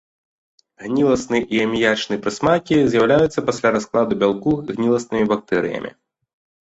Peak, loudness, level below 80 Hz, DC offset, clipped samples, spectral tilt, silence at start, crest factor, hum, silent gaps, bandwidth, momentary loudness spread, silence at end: -2 dBFS; -19 LUFS; -50 dBFS; under 0.1%; under 0.1%; -5.5 dB/octave; 0.8 s; 16 dB; none; none; 8.2 kHz; 7 LU; 0.75 s